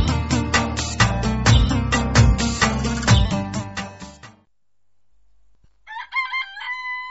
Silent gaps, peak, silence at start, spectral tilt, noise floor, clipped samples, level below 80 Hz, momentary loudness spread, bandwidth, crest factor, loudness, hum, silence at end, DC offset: none; -4 dBFS; 0 s; -4.5 dB/octave; -66 dBFS; under 0.1%; -28 dBFS; 15 LU; 8.2 kHz; 18 dB; -20 LUFS; 50 Hz at -45 dBFS; 0 s; under 0.1%